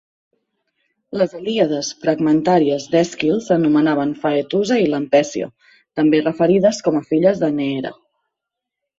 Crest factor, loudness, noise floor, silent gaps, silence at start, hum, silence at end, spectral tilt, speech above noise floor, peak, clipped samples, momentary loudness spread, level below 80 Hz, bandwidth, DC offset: 16 dB; -17 LUFS; -82 dBFS; none; 1.1 s; none; 1.05 s; -6 dB/octave; 65 dB; -2 dBFS; under 0.1%; 8 LU; -60 dBFS; 7.8 kHz; under 0.1%